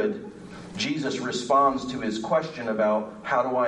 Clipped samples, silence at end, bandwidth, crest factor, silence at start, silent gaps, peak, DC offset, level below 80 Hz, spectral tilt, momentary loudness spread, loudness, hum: under 0.1%; 0 s; 11 kHz; 16 dB; 0 s; none; -10 dBFS; under 0.1%; -60 dBFS; -4.5 dB/octave; 14 LU; -26 LUFS; none